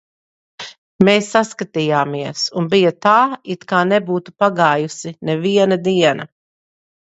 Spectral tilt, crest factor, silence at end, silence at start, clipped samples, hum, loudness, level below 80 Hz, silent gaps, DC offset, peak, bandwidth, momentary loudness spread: -5 dB/octave; 18 dB; 0.8 s; 0.6 s; under 0.1%; none; -16 LUFS; -60 dBFS; 0.78-0.99 s; under 0.1%; 0 dBFS; 8.2 kHz; 13 LU